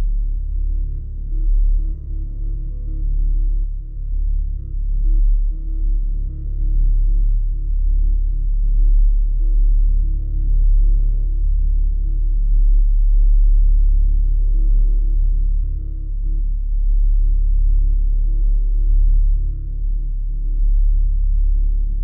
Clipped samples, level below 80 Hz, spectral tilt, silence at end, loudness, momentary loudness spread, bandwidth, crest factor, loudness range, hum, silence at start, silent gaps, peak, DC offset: under 0.1%; -14 dBFS; -14.5 dB/octave; 0 s; -22 LUFS; 8 LU; 0.5 kHz; 8 dB; 5 LU; none; 0 s; none; -6 dBFS; under 0.1%